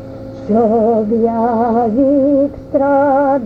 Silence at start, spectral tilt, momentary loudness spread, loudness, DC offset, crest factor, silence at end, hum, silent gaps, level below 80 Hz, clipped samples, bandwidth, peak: 0 s; -10 dB/octave; 5 LU; -13 LUFS; under 0.1%; 10 dB; 0 s; none; none; -42 dBFS; under 0.1%; 5.2 kHz; -2 dBFS